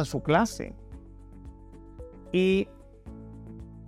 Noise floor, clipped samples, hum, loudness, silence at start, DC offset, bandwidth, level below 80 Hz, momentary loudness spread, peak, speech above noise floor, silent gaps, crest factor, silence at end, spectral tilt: -47 dBFS; under 0.1%; none; -27 LUFS; 0 s; under 0.1%; 14.5 kHz; -48 dBFS; 24 LU; -10 dBFS; 21 dB; none; 22 dB; 0 s; -6 dB/octave